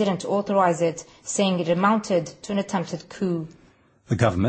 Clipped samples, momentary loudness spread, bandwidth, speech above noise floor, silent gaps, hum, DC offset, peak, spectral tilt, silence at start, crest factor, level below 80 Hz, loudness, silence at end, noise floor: under 0.1%; 9 LU; 8.8 kHz; 33 dB; none; none; under 0.1%; -4 dBFS; -5.5 dB/octave; 0 s; 20 dB; -56 dBFS; -24 LUFS; 0 s; -56 dBFS